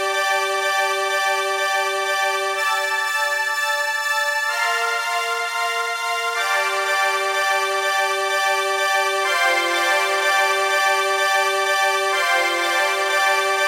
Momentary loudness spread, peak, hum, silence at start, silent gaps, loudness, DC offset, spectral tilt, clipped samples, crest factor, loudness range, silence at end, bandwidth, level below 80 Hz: 3 LU; -6 dBFS; none; 0 s; none; -19 LUFS; under 0.1%; 2 dB/octave; under 0.1%; 14 dB; 3 LU; 0 s; 16 kHz; -86 dBFS